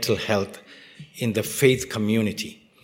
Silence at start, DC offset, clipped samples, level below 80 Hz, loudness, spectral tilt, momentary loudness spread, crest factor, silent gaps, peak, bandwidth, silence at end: 0 s; under 0.1%; under 0.1%; -56 dBFS; -24 LUFS; -4.5 dB/octave; 20 LU; 22 dB; none; -2 dBFS; 16.5 kHz; 0.3 s